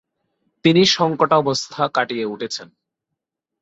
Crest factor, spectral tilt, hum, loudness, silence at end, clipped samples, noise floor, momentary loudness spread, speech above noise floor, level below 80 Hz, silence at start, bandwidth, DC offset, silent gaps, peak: 18 dB; -4.5 dB/octave; none; -18 LUFS; 1 s; under 0.1%; -82 dBFS; 13 LU; 64 dB; -60 dBFS; 0.65 s; 8 kHz; under 0.1%; none; -2 dBFS